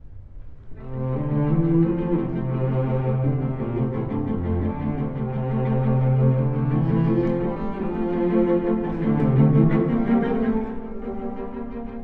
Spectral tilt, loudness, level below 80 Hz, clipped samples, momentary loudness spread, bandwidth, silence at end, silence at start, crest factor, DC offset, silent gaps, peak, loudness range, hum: -12 dB/octave; -23 LUFS; -38 dBFS; under 0.1%; 12 LU; 4 kHz; 0 s; 0.05 s; 16 dB; under 0.1%; none; -6 dBFS; 4 LU; none